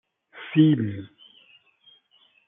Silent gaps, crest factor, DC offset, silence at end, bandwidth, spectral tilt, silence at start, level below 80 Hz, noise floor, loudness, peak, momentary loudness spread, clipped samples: none; 20 dB; under 0.1%; 1.4 s; 3.8 kHz; -11.5 dB/octave; 0.35 s; -74 dBFS; -62 dBFS; -22 LUFS; -6 dBFS; 23 LU; under 0.1%